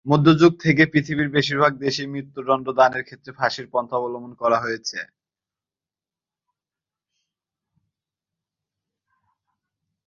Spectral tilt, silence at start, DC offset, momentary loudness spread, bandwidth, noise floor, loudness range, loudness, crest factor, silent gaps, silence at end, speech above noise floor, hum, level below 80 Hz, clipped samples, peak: -6 dB/octave; 0.05 s; under 0.1%; 15 LU; 7.4 kHz; under -90 dBFS; 10 LU; -20 LUFS; 22 dB; none; 5.05 s; over 70 dB; none; -60 dBFS; under 0.1%; -2 dBFS